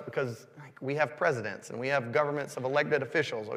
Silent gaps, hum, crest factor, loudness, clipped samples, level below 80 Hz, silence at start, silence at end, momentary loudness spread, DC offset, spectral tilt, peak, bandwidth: none; none; 20 dB; -31 LUFS; under 0.1%; -82 dBFS; 0 s; 0 s; 10 LU; under 0.1%; -5.5 dB/octave; -12 dBFS; 15 kHz